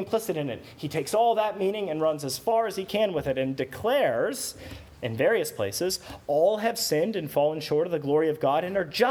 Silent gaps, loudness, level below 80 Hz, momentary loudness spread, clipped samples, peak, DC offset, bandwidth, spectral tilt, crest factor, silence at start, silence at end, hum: none; -26 LUFS; -58 dBFS; 9 LU; under 0.1%; -10 dBFS; under 0.1%; over 20 kHz; -4.5 dB/octave; 18 dB; 0 s; 0 s; none